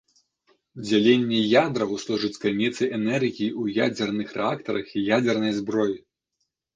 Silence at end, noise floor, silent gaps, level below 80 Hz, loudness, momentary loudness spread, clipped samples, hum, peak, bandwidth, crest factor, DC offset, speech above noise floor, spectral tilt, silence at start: 0.8 s; -78 dBFS; none; -64 dBFS; -24 LUFS; 8 LU; under 0.1%; none; -4 dBFS; 9.4 kHz; 20 dB; under 0.1%; 55 dB; -5.5 dB/octave; 0.75 s